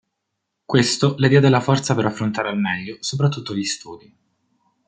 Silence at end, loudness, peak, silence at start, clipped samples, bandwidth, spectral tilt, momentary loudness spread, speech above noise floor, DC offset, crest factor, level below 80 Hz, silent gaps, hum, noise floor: 0.9 s; -19 LUFS; -2 dBFS; 0.7 s; under 0.1%; 9.4 kHz; -5.5 dB/octave; 11 LU; 59 dB; under 0.1%; 20 dB; -60 dBFS; none; none; -78 dBFS